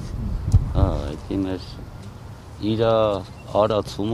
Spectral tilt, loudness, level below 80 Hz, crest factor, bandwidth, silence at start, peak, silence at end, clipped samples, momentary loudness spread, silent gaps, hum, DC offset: -7.5 dB/octave; -23 LUFS; -30 dBFS; 18 dB; 12.5 kHz; 0 s; -4 dBFS; 0 s; under 0.1%; 19 LU; none; none; under 0.1%